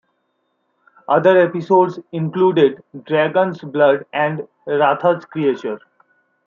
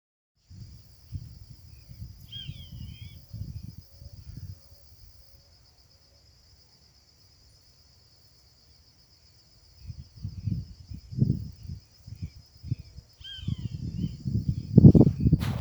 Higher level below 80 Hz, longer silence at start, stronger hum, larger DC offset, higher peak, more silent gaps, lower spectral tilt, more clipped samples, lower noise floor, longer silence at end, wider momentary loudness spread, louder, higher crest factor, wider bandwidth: second, -70 dBFS vs -44 dBFS; first, 1.1 s vs 0.5 s; neither; neither; about the same, -2 dBFS vs 0 dBFS; neither; about the same, -8 dB/octave vs -9 dB/octave; neither; first, -68 dBFS vs -59 dBFS; first, 0.7 s vs 0 s; second, 11 LU vs 26 LU; first, -17 LUFS vs -25 LUFS; second, 16 dB vs 30 dB; second, 7 kHz vs over 20 kHz